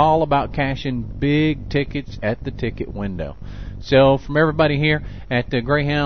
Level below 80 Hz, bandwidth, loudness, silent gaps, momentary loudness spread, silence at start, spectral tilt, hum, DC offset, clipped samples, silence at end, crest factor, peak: -34 dBFS; 6.4 kHz; -20 LUFS; none; 12 LU; 0 s; -8 dB/octave; none; 1%; under 0.1%; 0 s; 16 dB; -2 dBFS